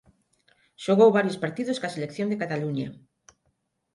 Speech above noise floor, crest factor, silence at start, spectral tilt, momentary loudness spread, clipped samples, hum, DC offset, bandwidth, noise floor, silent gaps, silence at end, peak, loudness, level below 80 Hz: 50 dB; 20 dB; 0.8 s; -6.5 dB/octave; 14 LU; under 0.1%; none; under 0.1%; 11.5 kHz; -74 dBFS; none; 1 s; -8 dBFS; -25 LUFS; -70 dBFS